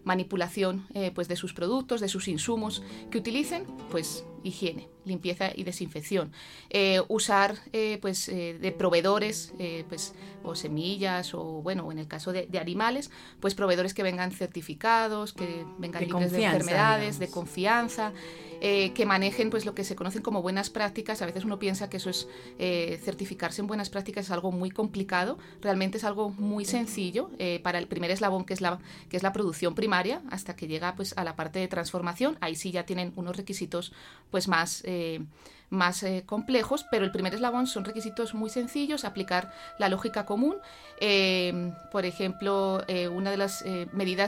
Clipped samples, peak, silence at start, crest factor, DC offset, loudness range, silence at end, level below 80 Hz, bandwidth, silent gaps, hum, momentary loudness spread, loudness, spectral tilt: under 0.1%; -8 dBFS; 0 s; 22 dB; under 0.1%; 5 LU; 0 s; -62 dBFS; 16.5 kHz; none; none; 10 LU; -30 LUFS; -4.5 dB/octave